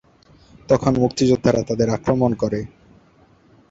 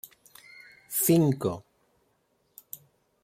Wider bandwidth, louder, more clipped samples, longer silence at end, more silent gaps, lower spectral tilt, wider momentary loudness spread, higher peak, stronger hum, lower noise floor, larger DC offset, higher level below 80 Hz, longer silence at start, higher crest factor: second, 8 kHz vs 16.5 kHz; first, -19 LUFS vs -25 LUFS; neither; second, 1.05 s vs 1.65 s; neither; about the same, -6.5 dB/octave vs -5.5 dB/octave; second, 7 LU vs 26 LU; first, -2 dBFS vs -10 dBFS; neither; second, -54 dBFS vs -71 dBFS; neither; first, -46 dBFS vs -70 dBFS; second, 0.7 s vs 0.9 s; about the same, 18 dB vs 20 dB